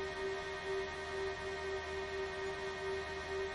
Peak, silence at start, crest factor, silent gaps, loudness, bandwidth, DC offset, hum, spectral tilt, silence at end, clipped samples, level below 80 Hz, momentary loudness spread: -28 dBFS; 0 s; 12 dB; none; -41 LUFS; 11.5 kHz; under 0.1%; none; -4 dB/octave; 0 s; under 0.1%; -58 dBFS; 1 LU